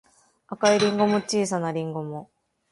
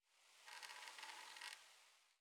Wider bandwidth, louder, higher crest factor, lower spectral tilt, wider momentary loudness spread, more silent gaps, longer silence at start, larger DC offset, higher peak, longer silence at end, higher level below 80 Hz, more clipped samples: second, 11.5 kHz vs 18 kHz; first, -23 LUFS vs -56 LUFS; second, 18 dB vs 26 dB; first, -4.5 dB/octave vs 3 dB/octave; first, 16 LU vs 11 LU; neither; first, 0.5 s vs 0.05 s; neither; first, -6 dBFS vs -34 dBFS; first, 0.5 s vs 0.05 s; first, -66 dBFS vs under -90 dBFS; neither